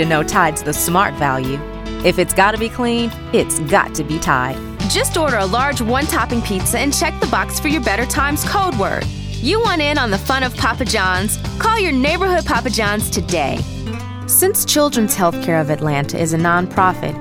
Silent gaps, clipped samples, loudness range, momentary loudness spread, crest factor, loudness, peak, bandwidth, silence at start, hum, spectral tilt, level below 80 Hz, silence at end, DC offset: none; under 0.1%; 1 LU; 6 LU; 16 dB; -16 LUFS; 0 dBFS; 19 kHz; 0 s; none; -4 dB/octave; -30 dBFS; 0 s; under 0.1%